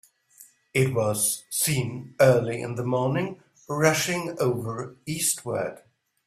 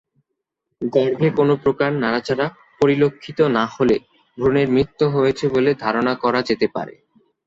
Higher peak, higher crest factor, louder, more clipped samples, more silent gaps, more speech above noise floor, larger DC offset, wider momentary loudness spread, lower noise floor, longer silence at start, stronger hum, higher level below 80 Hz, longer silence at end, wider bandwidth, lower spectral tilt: about the same, -4 dBFS vs -4 dBFS; first, 22 dB vs 16 dB; second, -25 LUFS vs -19 LUFS; neither; neither; second, 30 dB vs 60 dB; neither; first, 13 LU vs 6 LU; second, -55 dBFS vs -79 dBFS; second, 0.4 s vs 0.8 s; neither; second, -60 dBFS vs -52 dBFS; about the same, 0.5 s vs 0.55 s; first, 15.5 kHz vs 7.6 kHz; second, -4 dB/octave vs -7 dB/octave